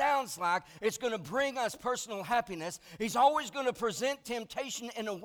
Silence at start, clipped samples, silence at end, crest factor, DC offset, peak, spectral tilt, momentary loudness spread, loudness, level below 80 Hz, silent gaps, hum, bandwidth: 0 s; under 0.1%; 0 s; 20 dB; under 0.1%; -14 dBFS; -3 dB/octave; 10 LU; -33 LUFS; -68 dBFS; none; none; over 20 kHz